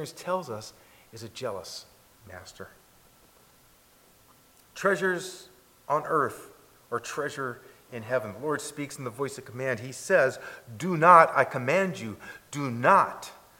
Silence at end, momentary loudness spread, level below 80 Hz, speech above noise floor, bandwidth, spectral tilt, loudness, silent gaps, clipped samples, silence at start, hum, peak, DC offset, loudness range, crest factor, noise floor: 0.25 s; 24 LU; -70 dBFS; 32 dB; 17 kHz; -5 dB/octave; -26 LUFS; none; under 0.1%; 0 s; none; -2 dBFS; under 0.1%; 19 LU; 26 dB; -59 dBFS